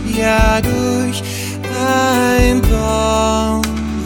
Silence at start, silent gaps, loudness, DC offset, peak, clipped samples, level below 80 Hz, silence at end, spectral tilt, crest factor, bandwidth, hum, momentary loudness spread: 0 s; none; -15 LUFS; under 0.1%; 0 dBFS; under 0.1%; -22 dBFS; 0 s; -5 dB/octave; 14 dB; 19 kHz; none; 8 LU